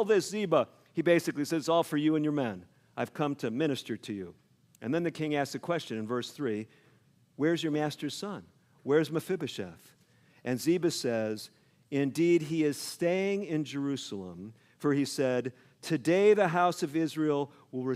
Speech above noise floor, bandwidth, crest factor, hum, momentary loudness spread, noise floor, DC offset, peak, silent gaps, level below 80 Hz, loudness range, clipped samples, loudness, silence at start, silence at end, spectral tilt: 35 dB; 16 kHz; 18 dB; none; 14 LU; -65 dBFS; under 0.1%; -12 dBFS; none; -78 dBFS; 5 LU; under 0.1%; -30 LUFS; 0 s; 0 s; -5.5 dB/octave